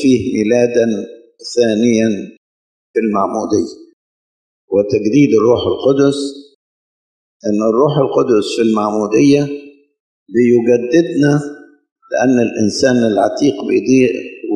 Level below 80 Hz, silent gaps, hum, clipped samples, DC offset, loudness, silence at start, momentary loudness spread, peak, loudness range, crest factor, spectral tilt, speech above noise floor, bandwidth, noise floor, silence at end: -54 dBFS; 2.37-2.94 s, 3.93-4.68 s, 6.55-7.40 s, 10.00-10.26 s, 11.92-11.96 s; none; under 0.1%; under 0.1%; -14 LUFS; 0 s; 11 LU; 0 dBFS; 4 LU; 14 dB; -6 dB/octave; over 77 dB; 10 kHz; under -90 dBFS; 0 s